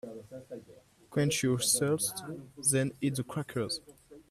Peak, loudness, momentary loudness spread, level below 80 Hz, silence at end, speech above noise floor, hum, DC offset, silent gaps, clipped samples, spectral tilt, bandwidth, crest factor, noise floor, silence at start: -14 dBFS; -31 LUFS; 19 LU; -68 dBFS; 0.1 s; 26 dB; none; under 0.1%; none; under 0.1%; -4 dB/octave; 15.5 kHz; 20 dB; -58 dBFS; 0.05 s